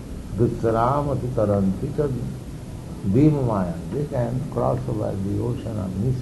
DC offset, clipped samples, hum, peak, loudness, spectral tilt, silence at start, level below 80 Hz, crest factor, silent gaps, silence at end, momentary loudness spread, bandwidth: under 0.1%; under 0.1%; none; -6 dBFS; -23 LUFS; -9 dB/octave; 0 s; -38 dBFS; 16 dB; none; 0 s; 12 LU; 12 kHz